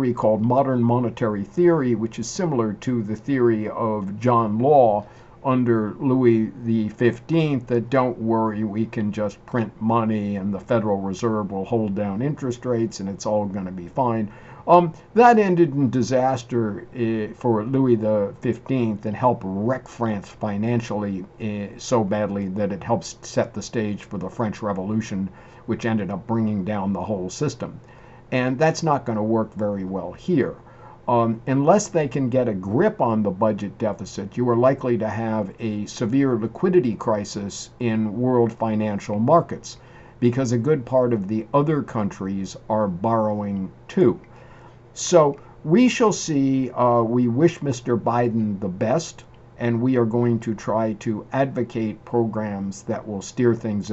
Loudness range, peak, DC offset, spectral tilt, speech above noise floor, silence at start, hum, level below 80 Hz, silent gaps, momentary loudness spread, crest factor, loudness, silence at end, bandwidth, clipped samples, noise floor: 6 LU; -2 dBFS; under 0.1%; -7 dB/octave; 24 dB; 0 s; none; -54 dBFS; none; 10 LU; 20 dB; -22 LUFS; 0 s; 8.2 kHz; under 0.1%; -45 dBFS